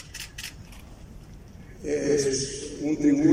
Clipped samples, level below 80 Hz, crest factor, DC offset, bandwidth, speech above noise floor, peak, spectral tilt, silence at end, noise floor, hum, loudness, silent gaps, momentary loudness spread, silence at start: under 0.1%; -48 dBFS; 18 dB; under 0.1%; 16 kHz; 21 dB; -8 dBFS; -4.5 dB/octave; 0 s; -45 dBFS; none; -27 LUFS; none; 23 LU; 0 s